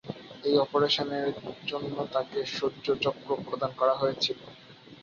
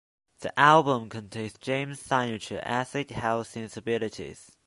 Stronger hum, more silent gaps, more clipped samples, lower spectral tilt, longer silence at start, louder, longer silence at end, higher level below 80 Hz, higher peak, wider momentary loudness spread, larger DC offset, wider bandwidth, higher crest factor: neither; neither; neither; about the same, -5 dB/octave vs -5 dB/octave; second, 0.05 s vs 0.4 s; about the same, -29 LUFS vs -27 LUFS; second, 0 s vs 0.25 s; second, -66 dBFS vs -60 dBFS; second, -10 dBFS vs -4 dBFS; second, 10 LU vs 18 LU; neither; second, 7.2 kHz vs 11.5 kHz; about the same, 20 dB vs 24 dB